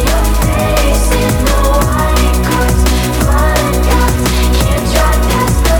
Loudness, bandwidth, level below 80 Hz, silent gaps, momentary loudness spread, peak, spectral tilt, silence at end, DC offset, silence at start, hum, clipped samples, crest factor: -12 LUFS; 18.5 kHz; -12 dBFS; none; 1 LU; 0 dBFS; -5 dB/octave; 0 s; under 0.1%; 0 s; none; under 0.1%; 10 dB